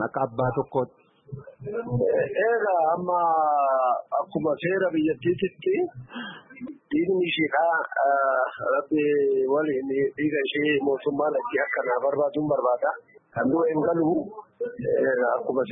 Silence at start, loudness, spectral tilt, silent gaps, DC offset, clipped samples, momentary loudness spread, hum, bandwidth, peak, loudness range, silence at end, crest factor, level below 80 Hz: 0 s; -24 LUFS; -10.5 dB/octave; none; under 0.1%; under 0.1%; 12 LU; none; 3.9 kHz; -12 dBFS; 2 LU; 0 s; 14 dB; -62 dBFS